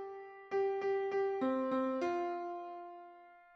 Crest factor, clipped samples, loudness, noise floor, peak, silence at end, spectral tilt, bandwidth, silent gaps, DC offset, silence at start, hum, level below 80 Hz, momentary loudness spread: 14 dB; under 0.1%; -36 LUFS; -58 dBFS; -24 dBFS; 0.15 s; -6 dB/octave; 6.6 kHz; none; under 0.1%; 0 s; none; -82 dBFS; 16 LU